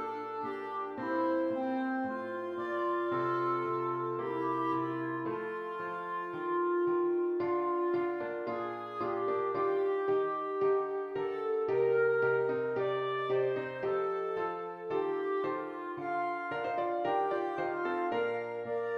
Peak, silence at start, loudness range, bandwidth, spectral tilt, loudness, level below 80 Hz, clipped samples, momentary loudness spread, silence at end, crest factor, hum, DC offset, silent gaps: -18 dBFS; 0 s; 3 LU; 5.8 kHz; -8 dB/octave; -33 LUFS; -78 dBFS; under 0.1%; 7 LU; 0 s; 14 dB; none; under 0.1%; none